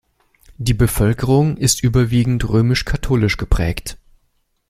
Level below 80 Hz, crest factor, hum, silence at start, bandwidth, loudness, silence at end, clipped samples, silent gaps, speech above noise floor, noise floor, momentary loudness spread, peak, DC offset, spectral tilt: -28 dBFS; 16 dB; none; 0.6 s; 16 kHz; -17 LUFS; 0.75 s; under 0.1%; none; 49 dB; -64 dBFS; 7 LU; -2 dBFS; under 0.1%; -5.5 dB/octave